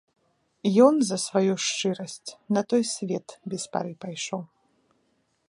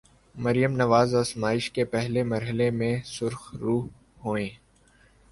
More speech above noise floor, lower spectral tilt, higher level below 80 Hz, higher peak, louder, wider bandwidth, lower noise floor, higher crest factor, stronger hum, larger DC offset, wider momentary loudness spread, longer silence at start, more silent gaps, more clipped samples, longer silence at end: first, 45 dB vs 34 dB; second, -4.5 dB/octave vs -6 dB/octave; second, -76 dBFS vs -56 dBFS; about the same, -4 dBFS vs -6 dBFS; about the same, -25 LUFS vs -26 LUFS; about the same, 11.5 kHz vs 11.5 kHz; first, -70 dBFS vs -59 dBFS; about the same, 22 dB vs 20 dB; neither; neither; first, 15 LU vs 11 LU; first, 0.65 s vs 0.35 s; neither; neither; first, 1.05 s vs 0.75 s